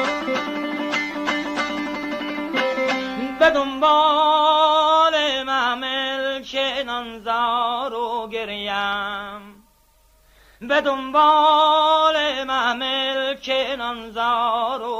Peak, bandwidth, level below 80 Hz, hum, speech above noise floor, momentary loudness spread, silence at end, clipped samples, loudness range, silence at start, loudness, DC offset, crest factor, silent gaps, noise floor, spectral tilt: -4 dBFS; 16 kHz; -56 dBFS; none; 37 dB; 11 LU; 0 s; under 0.1%; 7 LU; 0 s; -20 LUFS; under 0.1%; 16 dB; none; -57 dBFS; -2.5 dB/octave